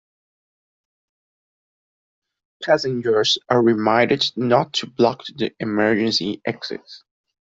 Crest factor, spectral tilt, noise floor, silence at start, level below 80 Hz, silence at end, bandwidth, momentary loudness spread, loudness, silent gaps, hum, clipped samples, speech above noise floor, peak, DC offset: 18 dB; -4.5 dB/octave; under -90 dBFS; 2.6 s; -62 dBFS; 0.5 s; 7.8 kHz; 10 LU; -19 LUFS; none; none; under 0.1%; over 70 dB; -2 dBFS; under 0.1%